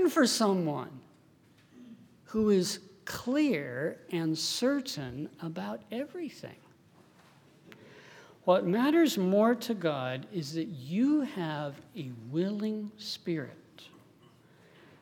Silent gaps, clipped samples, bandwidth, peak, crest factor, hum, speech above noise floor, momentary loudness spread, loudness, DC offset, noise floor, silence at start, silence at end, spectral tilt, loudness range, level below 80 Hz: none; under 0.1%; 19.5 kHz; -12 dBFS; 20 dB; none; 32 dB; 15 LU; -31 LUFS; under 0.1%; -62 dBFS; 0 s; 1.15 s; -5 dB/octave; 9 LU; -72 dBFS